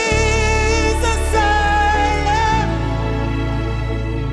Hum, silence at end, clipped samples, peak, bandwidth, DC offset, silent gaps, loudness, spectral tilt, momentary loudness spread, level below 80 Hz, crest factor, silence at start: none; 0 s; under 0.1%; -4 dBFS; 12.5 kHz; under 0.1%; none; -17 LUFS; -5 dB/octave; 7 LU; -22 dBFS; 14 dB; 0 s